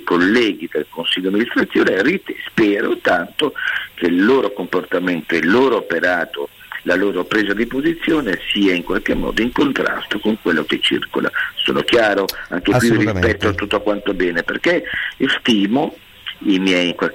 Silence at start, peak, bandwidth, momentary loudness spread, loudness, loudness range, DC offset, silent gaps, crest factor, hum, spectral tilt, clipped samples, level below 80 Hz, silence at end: 0 s; -6 dBFS; 16.5 kHz; 7 LU; -17 LUFS; 1 LU; under 0.1%; none; 12 dB; none; -5 dB/octave; under 0.1%; -42 dBFS; 0 s